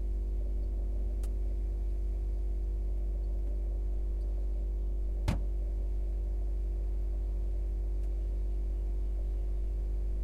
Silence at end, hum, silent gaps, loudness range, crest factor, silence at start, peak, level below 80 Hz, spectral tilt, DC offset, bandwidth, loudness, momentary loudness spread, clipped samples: 0 s; none; none; 0 LU; 16 dB; 0 s; -16 dBFS; -32 dBFS; -8 dB/octave; under 0.1%; 4.3 kHz; -36 LUFS; 0 LU; under 0.1%